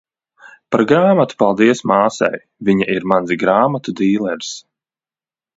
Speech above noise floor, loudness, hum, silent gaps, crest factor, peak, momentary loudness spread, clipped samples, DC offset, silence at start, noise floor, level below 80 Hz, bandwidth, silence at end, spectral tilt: over 75 dB; -15 LUFS; none; none; 16 dB; 0 dBFS; 9 LU; under 0.1%; under 0.1%; 0.45 s; under -90 dBFS; -58 dBFS; 8 kHz; 0.95 s; -6 dB/octave